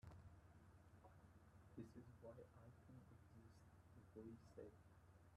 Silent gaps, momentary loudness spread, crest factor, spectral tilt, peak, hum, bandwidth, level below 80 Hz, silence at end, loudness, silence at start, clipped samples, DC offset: none; 8 LU; 22 dB; -7.5 dB/octave; -44 dBFS; none; 12 kHz; -76 dBFS; 0 s; -65 LUFS; 0 s; under 0.1%; under 0.1%